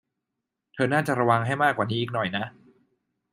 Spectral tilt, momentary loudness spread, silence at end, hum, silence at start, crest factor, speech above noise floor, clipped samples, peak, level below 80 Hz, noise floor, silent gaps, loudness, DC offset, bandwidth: -6 dB/octave; 10 LU; 0.8 s; none; 0.75 s; 20 dB; 59 dB; under 0.1%; -6 dBFS; -68 dBFS; -84 dBFS; none; -25 LUFS; under 0.1%; 13.5 kHz